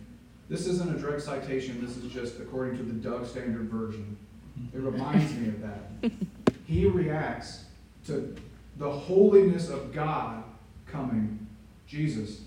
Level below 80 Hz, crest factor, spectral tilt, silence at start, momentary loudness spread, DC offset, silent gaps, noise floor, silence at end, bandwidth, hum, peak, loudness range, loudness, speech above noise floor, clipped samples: -50 dBFS; 22 dB; -7.5 dB/octave; 0 s; 17 LU; under 0.1%; none; -50 dBFS; 0 s; 10.5 kHz; none; -8 dBFS; 8 LU; -29 LUFS; 21 dB; under 0.1%